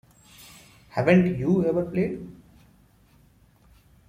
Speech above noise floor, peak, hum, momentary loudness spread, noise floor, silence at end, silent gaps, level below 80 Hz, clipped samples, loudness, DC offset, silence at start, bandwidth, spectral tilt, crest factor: 36 dB; -4 dBFS; none; 25 LU; -58 dBFS; 1.75 s; none; -54 dBFS; under 0.1%; -23 LUFS; under 0.1%; 0.95 s; 15 kHz; -8.5 dB/octave; 22 dB